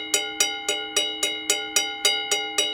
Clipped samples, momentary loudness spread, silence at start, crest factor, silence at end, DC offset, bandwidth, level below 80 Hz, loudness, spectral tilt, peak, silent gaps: under 0.1%; 3 LU; 0 s; 22 dB; 0 s; under 0.1%; 19 kHz; -66 dBFS; -22 LUFS; 2 dB/octave; -4 dBFS; none